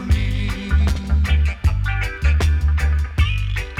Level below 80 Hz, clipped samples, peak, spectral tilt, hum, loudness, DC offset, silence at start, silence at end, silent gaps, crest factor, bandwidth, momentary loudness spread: -18 dBFS; under 0.1%; -6 dBFS; -6 dB/octave; none; -20 LUFS; under 0.1%; 0 s; 0 s; none; 12 dB; 11 kHz; 5 LU